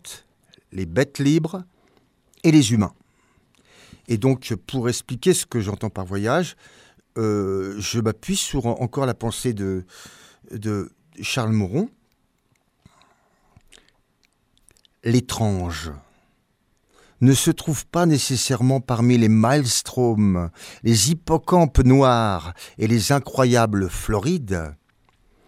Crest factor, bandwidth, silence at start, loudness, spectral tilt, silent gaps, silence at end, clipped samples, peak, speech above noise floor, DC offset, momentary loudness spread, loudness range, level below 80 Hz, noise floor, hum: 20 dB; 16 kHz; 0.05 s; -21 LUFS; -5.5 dB/octave; none; 0.75 s; under 0.1%; -2 dBFS; 46 dB; under 0.1%; 14 LU; 9 LU; -38 dBFS; -66 dBFS; none